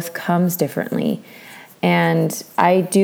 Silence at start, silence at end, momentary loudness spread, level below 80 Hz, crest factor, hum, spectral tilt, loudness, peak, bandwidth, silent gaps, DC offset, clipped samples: 0 s; 0 s; 17 LU; -70 dBFS; 18 dB; none; -5.5 dB/octave; -19 LUFS; -2 dBFS; over 20 kHz; none; under 0.1%; under 0.1%